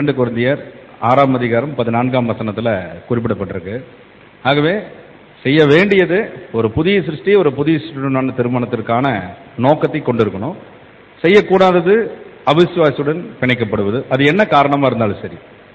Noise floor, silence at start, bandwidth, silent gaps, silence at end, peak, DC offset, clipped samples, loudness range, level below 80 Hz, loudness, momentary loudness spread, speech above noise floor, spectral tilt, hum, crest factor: -41 dBFS; 0 s; 8 kHz; none; 0.35 s; 0 dBFS; under 0.1%; under 0.1%; 4 LU; -48 dBFS; -15 LUFS; 12 LU; 27 dB; -8 dB/octave; none; 14 dB